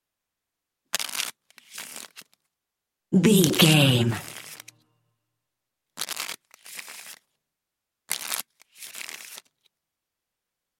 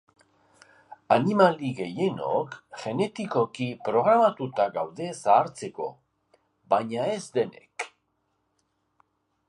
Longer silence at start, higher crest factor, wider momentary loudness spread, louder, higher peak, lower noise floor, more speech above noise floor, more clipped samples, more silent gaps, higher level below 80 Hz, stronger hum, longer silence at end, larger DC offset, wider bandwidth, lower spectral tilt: about the same, 0.95 s vs 0.9 s; first, 26 dB vs 20 dB; first, 26 LU vs 15 LU; first, -23 LUFS vs -26 LUFS; first, -2 dBFS vs -6 dBFS; first, -85 dBFS vs -75 dBFS; first, 67 dB vs 49 dB; neither; neither; first, -68 dBFS vs -74 dBFS; neither; second, 1.45 s vs 1.6 s; neither; first, 17 kHz vs 11.5 kHz; second, -4 dB/octave vs -6 dB/octave